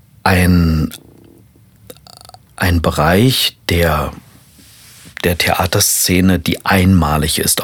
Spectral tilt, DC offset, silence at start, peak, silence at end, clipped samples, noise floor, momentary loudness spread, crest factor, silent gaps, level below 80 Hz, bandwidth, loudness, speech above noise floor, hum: -4 dB/octave; under 0.1%; 0.25 s; 0 dBFS; 0 s; under 0.1%; -46 dBFS; 8 LU; 14 dB; none; -34 dBFS; 19 kHz; -13 LUFS; 33 dB; none